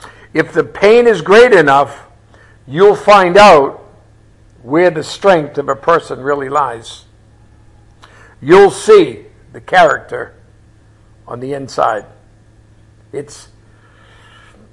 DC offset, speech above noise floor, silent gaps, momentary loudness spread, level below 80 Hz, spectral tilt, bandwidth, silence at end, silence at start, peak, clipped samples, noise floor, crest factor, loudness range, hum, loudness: under 0.1%; 35 dB; none; 21 LU; -44 dBFS; -5 dB/octave; 11.5 kHz; 1.5 s; 0.35 s; 0 dBFS; 0.3%; -45 dBFS; 12 dB; 14 LU; none; -10 LUFS